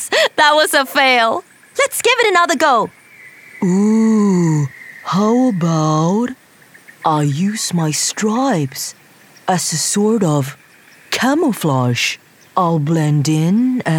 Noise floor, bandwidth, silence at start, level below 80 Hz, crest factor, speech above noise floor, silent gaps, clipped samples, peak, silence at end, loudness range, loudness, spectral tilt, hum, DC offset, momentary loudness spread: -45 dBFS; 18.5 kHz; 0 s; -64 dBFS; 14 dB; 31 dB; none; under 0.1%; 0 dBFS; 0 s; 4 LU; -15 LUFS; -4.5 dB/octave; none; under 0.1%; 11 LU